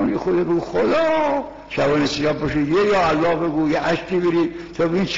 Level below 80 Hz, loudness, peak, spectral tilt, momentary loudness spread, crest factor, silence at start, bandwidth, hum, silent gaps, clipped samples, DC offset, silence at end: -44 dBFS; -19 LUFS; -10 dBFS; -4.5 dB/octave; 5 LU; 10 dB; 0 s; 7.6 kHz; none; none; under 0.1%; 0.5%; 0 s